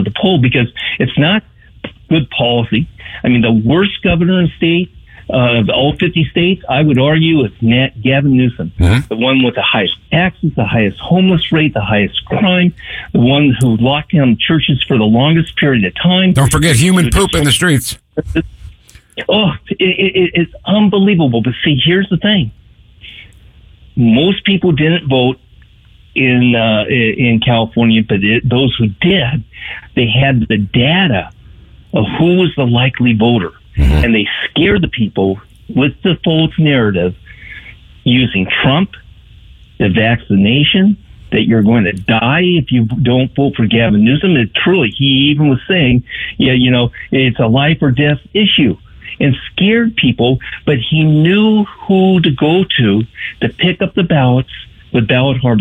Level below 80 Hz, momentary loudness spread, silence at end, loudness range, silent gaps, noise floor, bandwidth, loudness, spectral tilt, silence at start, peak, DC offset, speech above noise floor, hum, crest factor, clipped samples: -30 dBFS; 7 LU; 0 s; 3 LU; none; -43 dBFS; 15.5 kHz; -12 LUFS; -6 dB/octave; 0 s; -2 dBFS; under 0.1%; 32 dB; none; 10 dB; under 0.1%